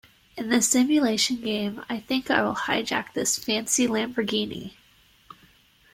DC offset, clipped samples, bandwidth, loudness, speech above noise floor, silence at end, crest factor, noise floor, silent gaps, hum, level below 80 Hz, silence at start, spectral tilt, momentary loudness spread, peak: under 0.1%; under 0.1%; 16.5 kHz; -24 LUFS; 34 dB; 1.25 s; 20 dB; -58 dBFS; none; none; -62 dBFS; 0.35 s; -2.5 dB/octave; 13 LU; -6 dBFS